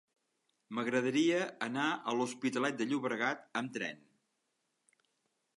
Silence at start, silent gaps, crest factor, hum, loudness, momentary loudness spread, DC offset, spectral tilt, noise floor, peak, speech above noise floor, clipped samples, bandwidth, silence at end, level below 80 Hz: 0.7 s; none; 18 dB; none; -35 LUFS; 9 LU; under 0.1%; -4.5 dB/octave; -82 dBFS; -18 dBFS; 48 dB; under 0.1%; 11.5 kHz; 1.65 s; -88 dBFS